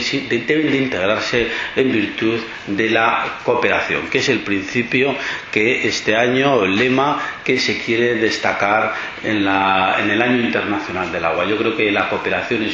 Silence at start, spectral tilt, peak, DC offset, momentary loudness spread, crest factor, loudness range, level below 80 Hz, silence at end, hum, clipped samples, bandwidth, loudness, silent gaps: 0 s; -4.5 dB/octave; 0 dBFS; under 0.1%; 5 LU; 18 dB; 1 LU; -50 dBFS; 0 s; none; under 0.1%; 7.6 kHz; -17 LUFS; none